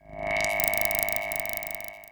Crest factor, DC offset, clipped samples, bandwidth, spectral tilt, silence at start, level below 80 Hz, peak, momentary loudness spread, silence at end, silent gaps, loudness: 30 dB; under 0.1%; under 0.1%; over 20 kHz; -2 dB/octave; 0.05 s; -50 dBFS; 0 dBFS; 9 LU; 0 s; none; -26 LUFS